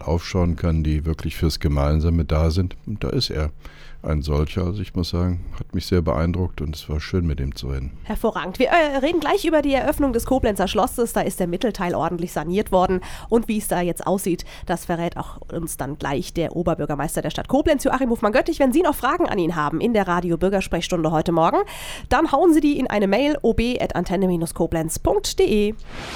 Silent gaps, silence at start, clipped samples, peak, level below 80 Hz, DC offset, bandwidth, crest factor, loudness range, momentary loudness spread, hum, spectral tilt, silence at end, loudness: none; 0 s; under 0.1%; -4 dBFS; -32 dBFS; under 0.1%; 19 kHz; 16 dB; 5 LU; 9 LU; none; -6 dB/octave; 0 s; -22 LUFS